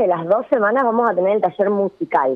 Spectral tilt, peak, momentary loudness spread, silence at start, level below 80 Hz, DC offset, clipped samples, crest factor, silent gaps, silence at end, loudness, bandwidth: -9 dB/octave; -4 dBFS; 3 LU; 0 s; -70 dBFS; under 0.1%; under 0.1%; 12 dB; none; 0 s; -18 LUFS; 4.7 kHz